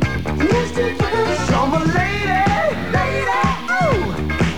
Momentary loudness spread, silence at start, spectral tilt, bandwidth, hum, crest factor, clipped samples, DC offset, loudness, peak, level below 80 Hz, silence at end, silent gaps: 3 LU; 0 s; -6 dB/octave; 19.5 kHz; none; 14 dB; under 0.1%; 2%; -18 LUFS; -4 dBFS; -30 dBFS; 0 s; none